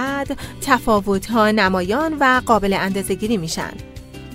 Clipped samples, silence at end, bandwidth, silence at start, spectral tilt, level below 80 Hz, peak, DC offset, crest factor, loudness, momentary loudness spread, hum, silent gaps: under 0.1%; 0 s; 16 kHz; 0 s; -4.5 dB/octave; -38 dBFS; 0 dBFS; under 0.1%; 18 dB; -18 LUFS; 12 LU; none; none